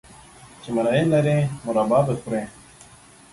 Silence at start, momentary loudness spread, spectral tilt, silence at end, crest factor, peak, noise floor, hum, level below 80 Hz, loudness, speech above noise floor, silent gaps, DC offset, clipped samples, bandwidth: 0.45 s; 10 LU; -7 dB/octave; 0.85 s; 16 dB; -6 dBFS; -49 dBFS; none; -54 dBFS; -22 LUFS; 28 dB; none; under 0.1%; under 0.1%; 11.5 kHz